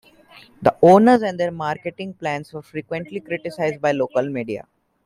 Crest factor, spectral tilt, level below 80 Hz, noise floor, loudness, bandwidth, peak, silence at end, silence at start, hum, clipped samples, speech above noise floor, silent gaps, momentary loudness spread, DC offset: 18 dB; -7 dB/octave; -60 dBFS; -48 dBFS; -20 LUFS; 13 kHz; -2 dBFS; 0.45 s; 0.6 s; none; under 0.1%; 29 dB; none; 17 LU; under 0.1%